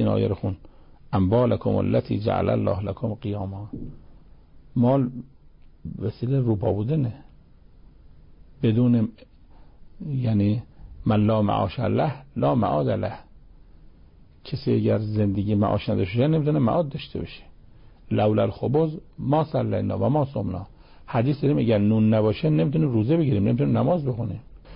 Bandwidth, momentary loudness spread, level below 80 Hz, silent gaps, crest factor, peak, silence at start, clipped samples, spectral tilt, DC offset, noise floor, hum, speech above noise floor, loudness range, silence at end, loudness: 5.4 kHz; 12 LU; -46 dBFS; none; 14 dB; -10 dBFS; 0 s; under 0.1%; -13 dB/octave; under 0.1%; -50 dBFS; none; 28 dB; 5 LU; 0 s; -24 LUFS